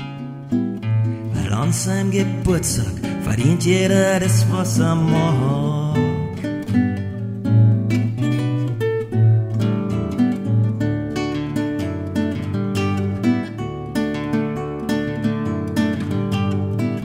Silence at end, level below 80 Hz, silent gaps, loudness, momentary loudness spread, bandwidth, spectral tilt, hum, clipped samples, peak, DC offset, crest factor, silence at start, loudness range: 0 s; -42 dBFS; none; -20 LUFS; 8 LU; 15 kHz; -6.5 dB/octave; none; under 0.1%; -2 dBFS; under 0.1%; 16 dB; 0 s; 5 LU